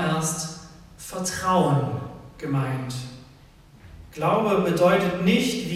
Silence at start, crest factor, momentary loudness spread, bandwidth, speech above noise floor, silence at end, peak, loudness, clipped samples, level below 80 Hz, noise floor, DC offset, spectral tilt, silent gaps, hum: 0 s; 18 dB; 18 LU; 15.5 kHz; 28 dB; 0 s; -6 dBFS; -23 LUFS; under 0.1%; -52 dBFS; -50 dBFS; under 0.1%; -5 dB/octave; none; none